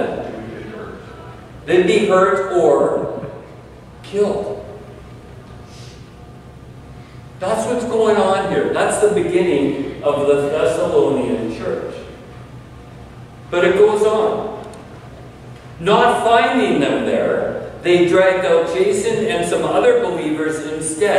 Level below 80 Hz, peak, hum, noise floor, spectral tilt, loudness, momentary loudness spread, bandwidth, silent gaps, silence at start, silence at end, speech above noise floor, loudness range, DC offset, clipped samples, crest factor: -46 dBFS; -2 dBFS; none; -38 dBFS; -5 dB/octave; -16 LUFS; 24 LU; 13 kHz; none; 0 s; 0 s; 23 dB; 11 LU; under 0.1%; under 0.1%; 16 dB